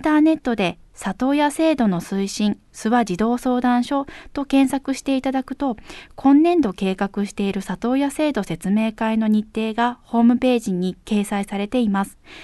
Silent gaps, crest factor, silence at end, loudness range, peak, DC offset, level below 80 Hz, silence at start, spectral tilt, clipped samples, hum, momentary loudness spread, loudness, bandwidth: none; 16 dB; 0 s; 1 LU; -4 dBFS; under 0.1%; -50 dBFS; 0 s; -6 dB/octave; under 0.1%; none; 8 LU; -21 LUFS; 12.5 kHz